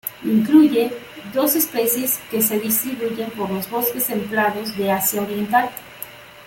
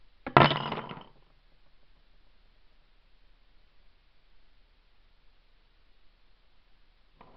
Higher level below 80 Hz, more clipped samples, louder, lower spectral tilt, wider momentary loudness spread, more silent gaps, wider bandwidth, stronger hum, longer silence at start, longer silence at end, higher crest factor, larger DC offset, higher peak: about the same, -60 dBFS vs -58 dBFS; neither; first, -19 LUFS vs -25 LUFS; about the same, -4 dB/octave vs -3.5 dB/octave; second, 12 LU vs 23 LU; neither; first, 17 kHz vs 6 kHz; neither; second, 0.05 s vs 0.25 s; second, 0 s vs 6.35 s; second, 18 dB vs 34 dB; neither; about the same, -2 dBFS vs 0 dBFS